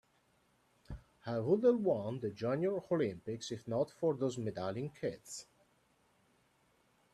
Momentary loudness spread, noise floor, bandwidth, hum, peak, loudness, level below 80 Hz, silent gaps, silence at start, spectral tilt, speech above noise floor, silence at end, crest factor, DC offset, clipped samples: 18 LU; -73 dBFS; 12.5 kHz; none; -18 dBFS; -36 LUFS; -66 dBFS; none; 0.9 s; -6.5 dB/octave; 38 dB; 1.7 s; 20 dB; under 0.1%; under 0.1%